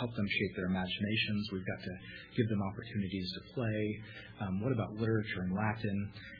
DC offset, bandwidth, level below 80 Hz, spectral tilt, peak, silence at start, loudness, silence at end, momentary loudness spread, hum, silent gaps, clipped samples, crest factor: under 0.1%; 5.2 kHz; -62 dBFS; -5 dB/octave; -18 dBFS; 0 s; -36 LUFS; 0 s; 8 LU; none; none; under 0.1%; 18 dB